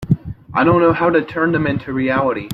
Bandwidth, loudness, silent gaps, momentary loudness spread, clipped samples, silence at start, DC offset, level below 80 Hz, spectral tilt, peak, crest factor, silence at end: 5.6 kHz; -17 LUFS; none; 8 LU; under 0.1%; 0 s; under 0.1%; -44 dBFS; -8 dB/octave; -2 dBFS; 14 dB; 0 s